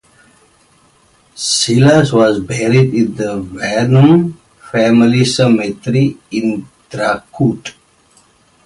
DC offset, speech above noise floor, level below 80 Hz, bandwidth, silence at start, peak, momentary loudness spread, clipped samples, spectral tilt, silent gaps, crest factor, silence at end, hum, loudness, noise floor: under 0.1%; 39 dB; -48 dBFS; 11.5 kHz; 1.35 s; 0 dBFS; 11 LU; under 0.1%; -5.5 dB/octave; none; 14 dB; 0.95 s; none; -13 LUFS; -51 dBFS